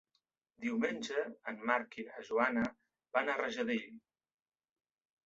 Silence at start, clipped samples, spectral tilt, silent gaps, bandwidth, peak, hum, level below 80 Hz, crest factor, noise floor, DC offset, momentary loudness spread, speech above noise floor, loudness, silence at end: 0.6 s; under 0.1%; -2.5 dB/octave; none; 7.8 kHz; -14 dBFS; none; -76 dBFS; 24 dB; -83 dBFS; under 0.1%; 9 LU; 47 dB; -37 LUFS; 1.25 s